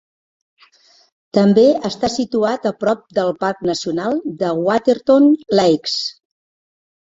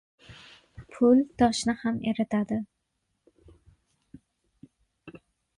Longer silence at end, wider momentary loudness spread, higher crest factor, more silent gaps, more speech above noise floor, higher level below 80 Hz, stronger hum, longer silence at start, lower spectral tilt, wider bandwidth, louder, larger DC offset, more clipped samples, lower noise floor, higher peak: first, 1.05 s vs 0.5 s; second, 9 LU vs 27 LU; about the same, 16 dB vs 20 dB; neither; second, 37 dB vs 54 dB; about the same, -58 dBFS vs -58 dBFS; neither; first, 1.35 s vs 0.3 s; about the same, -5.5 dB/octave vs -5 dB/octave; second, 7.8 kHz vs 11.5 kHz; first, -17 LUFS vs -26 LUFS; neither; neither; second, -52 dBFS vs -78 dBFS; first, -2 dBFS vs -8 dBFS